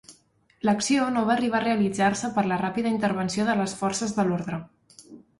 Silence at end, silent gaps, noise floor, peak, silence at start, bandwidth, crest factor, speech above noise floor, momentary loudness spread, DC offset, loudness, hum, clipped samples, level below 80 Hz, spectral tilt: 0.2 s; none; -62 dBFS; -10 dBFS; 0.1 s; 11.5 kHz; 16 dB; 37 dB; 4 LU; under 0.1%; -25 LUFS; none; under 0.1%; -60 dBFS; -5 dB/octave